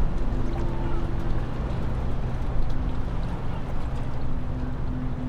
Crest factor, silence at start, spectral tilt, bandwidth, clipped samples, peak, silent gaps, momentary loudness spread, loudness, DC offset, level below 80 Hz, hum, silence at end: 14 dB; 0 s; -8.5 dB/octave; 5.2 kHz; under 0.1%; -10 dBFS; none; 3 LU; -31 LUFS; under 0.1%; -28 dBFS; none; 0 s